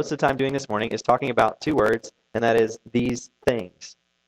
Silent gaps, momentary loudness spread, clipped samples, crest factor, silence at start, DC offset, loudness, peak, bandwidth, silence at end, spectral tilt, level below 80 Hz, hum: none; 10 LU; under 0.1%; 20 dB; 0 s; under 0.1%; -23 LUFS; -4 dBFS; 14.5 kHz; 0.35 s; -5.5 dB/octave; -52 dBFS; none